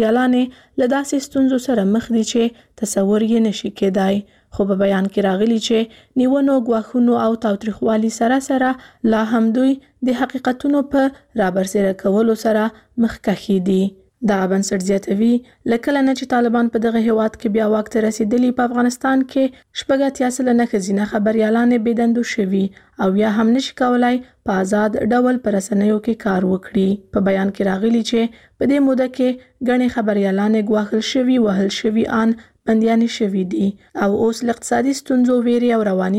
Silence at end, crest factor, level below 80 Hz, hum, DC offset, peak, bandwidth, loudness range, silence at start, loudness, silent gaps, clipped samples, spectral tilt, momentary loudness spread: 0 s; 12 dB; -52 dBFS; none; under 0.1%; -4 dBFS; 14 kHz; 1 LU; 0 s; -18 LUFS; none; under 0.1%; -6 dB/octave; 5 LU